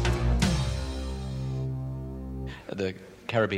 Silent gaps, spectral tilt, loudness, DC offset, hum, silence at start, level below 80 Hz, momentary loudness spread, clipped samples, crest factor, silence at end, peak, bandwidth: none; -6 dB/octave; -31 LUFS; under 0.1%; none; 0 s; -34 dBFS; 12 LU; under 0.1%; 18 dB; 0 s; -12 dBFS; 14.5 kHz